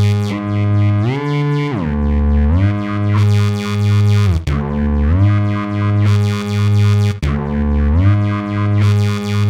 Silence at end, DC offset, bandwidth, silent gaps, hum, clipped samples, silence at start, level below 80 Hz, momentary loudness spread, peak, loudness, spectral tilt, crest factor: 0 s; under 0.1%; 9.2 kHz; none; none; under 0.1%; 0 s; -22 dBFS; 5 LU; -4 dBFS; -15 LUFS; -7.5 dB/octave; 10 dB